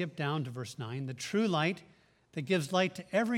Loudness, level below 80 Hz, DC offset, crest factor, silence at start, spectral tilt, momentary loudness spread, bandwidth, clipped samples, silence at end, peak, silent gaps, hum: -33 LUFS; -76 dBFS; under 0.1%; 18 dB; 0 s; -5.5 dB/octave; 12 LU; 16 kHz; under 0.1%; 0 s; -14 dBFS; none; none